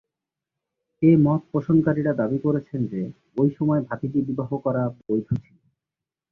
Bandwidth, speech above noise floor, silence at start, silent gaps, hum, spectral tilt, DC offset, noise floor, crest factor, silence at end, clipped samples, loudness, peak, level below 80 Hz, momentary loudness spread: 3.4 kHz; 66 dB; 1 s; none; none; -12 dB/octave; under 0.1%; -88 dBFS; 18 dB; 0.9 s; under 0.1%; -23 LUFS; -6 dBFS; -56 dBFS; 10 LU